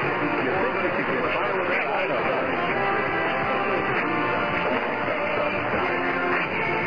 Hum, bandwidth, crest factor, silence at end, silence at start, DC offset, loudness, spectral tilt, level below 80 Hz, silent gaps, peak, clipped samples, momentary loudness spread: none; 5.2 kHz; 12 dB; 0 s; 0 s; 0.6%; -24 LUFS; -7 dB/octave; -54 dBFS; none; -12 dBFS; under 0.1%; 1 LU